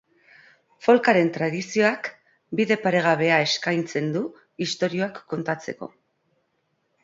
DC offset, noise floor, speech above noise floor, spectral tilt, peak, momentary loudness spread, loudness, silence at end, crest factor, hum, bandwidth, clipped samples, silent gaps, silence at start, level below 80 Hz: under 0.1%; -72 dBFS; 49 dB; -5 dB/octave; -4 dBFS; 13 LU; -23 LUFS; 1.15 s; 20 dB; none; 7.8 kHz; under 0.1%; none; 0.8 s; -70 dBFS